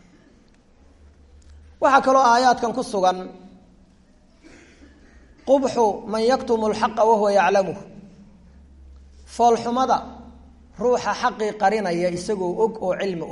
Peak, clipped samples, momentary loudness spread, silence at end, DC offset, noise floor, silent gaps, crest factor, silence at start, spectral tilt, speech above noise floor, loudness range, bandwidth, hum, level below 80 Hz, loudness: -2 dBFS; under 0.1%; 10 LU; 0 s; under 0.1%; -54 dBFS; none; 20 dB; 1.5 s; -4.5 dB/octave; 34 dB; 5 LU; 11.5 kHz; none; -52 dBFS; -20 LUFS